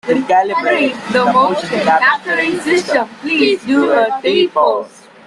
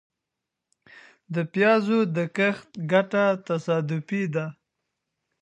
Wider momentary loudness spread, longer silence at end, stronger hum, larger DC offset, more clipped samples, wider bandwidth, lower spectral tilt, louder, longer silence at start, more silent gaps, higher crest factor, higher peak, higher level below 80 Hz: second, 5 LU vs 10 LU; second, 0.4 s vs 0.9 s; neither; neither; neither; first, 12 kHz vs 9 kHz; second, -4.5 dB/octave vs -7 dB/octave; first, -14 LUFS vs -24 LUFS; second, 0.05 s vs 0.95 s; neither; second, 14 dB vs 20 dB; first, 0 dBFS vs -4 dBFS; first, -58 dBFS vs -76 dBFS